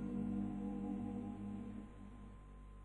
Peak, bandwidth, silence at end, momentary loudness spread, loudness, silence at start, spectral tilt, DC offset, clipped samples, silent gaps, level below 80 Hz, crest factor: -32 dBFS; 10 kHz; 0 s; 15 LU; -45 LUFS; 0 s; -9.5 dB/octave; under 0.1%; under 0.1%; none; -58 dBFS; 14 dB